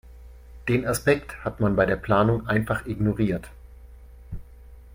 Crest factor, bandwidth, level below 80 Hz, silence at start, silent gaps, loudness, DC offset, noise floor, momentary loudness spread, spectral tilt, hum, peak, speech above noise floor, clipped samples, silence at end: 20 dB; 16.5 kHz; -42 dBFS; 0.05 s; none; -24 LUFS; under 0.1%; -46 dBFS; 21 LU; -6.5 dB/octave; none; -6 dBFS; 23 dB; under 0.1%; 0 s